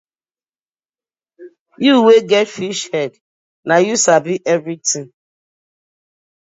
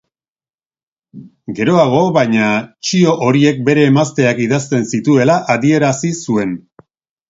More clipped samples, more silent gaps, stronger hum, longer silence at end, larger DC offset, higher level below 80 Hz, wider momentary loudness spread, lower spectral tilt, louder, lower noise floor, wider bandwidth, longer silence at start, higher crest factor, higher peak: neither; first, 1.60-1.66 s, 3.21-3.63 s vs none; neither; first, 1.45 s vs 0.7 s; neither; second, -70 dBFS vs -54 dBFS; first, 12 LU vs 7 LU; second, -3.5 dB/octave vs -6 dB/octave; about the same, -14 LUFS vs -13 LUFS; about the same, under -90 dBFS vs under -90 dBFS; about the same, 8 kHz vs 8 kHz; first, 1.4 s vs 1.15 s; about the same, 18 dB vs 14 dB; about the same, 0 dBFS vs 0 dBFS